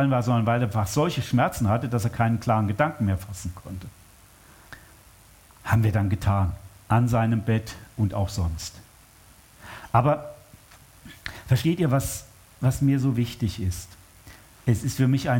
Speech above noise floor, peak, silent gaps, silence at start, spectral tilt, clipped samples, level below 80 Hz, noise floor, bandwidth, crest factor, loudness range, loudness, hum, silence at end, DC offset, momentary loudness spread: 29 dB; -4 dBFS; none; 0 s; -6.5 dB/octave; under 0.1%; -46 dBFS; -53 dBFS; 17 kHz; 20 dB; 5 LU; -25 LUFS; none; 0 s; under 0.1%; 17 LU